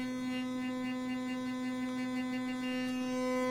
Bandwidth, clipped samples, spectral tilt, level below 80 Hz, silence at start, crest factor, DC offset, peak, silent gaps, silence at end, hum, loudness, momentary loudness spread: 15.5 kHz; under 0.1%; -4.5 dB/octave; -70 dBFS; 0 s; 12 dB; under 0.1%; -24 dBFS; none; 0 s; none; -36 LUFS; 3 LU